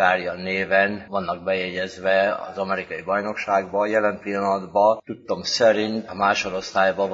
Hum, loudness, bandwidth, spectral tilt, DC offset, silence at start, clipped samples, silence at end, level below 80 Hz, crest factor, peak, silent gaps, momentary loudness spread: none; -22 LUFS; 7.8 kHz; -4 dB/octave; under 0.1%; 0 s; under 0.1%; 0 s; -60 dBFS; 18 dB; -4 dBFS; none; 8 LU